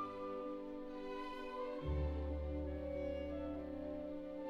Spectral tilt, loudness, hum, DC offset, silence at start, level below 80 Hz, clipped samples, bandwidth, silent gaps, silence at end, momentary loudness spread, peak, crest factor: -8.5 dB/octave; -45 LUFS; none; under 0.1%; 0 s; -48 dBFS; under 0.1%; 6.4 kHz; none; 0 s; 6 LU; -28 dBFS; 14 dB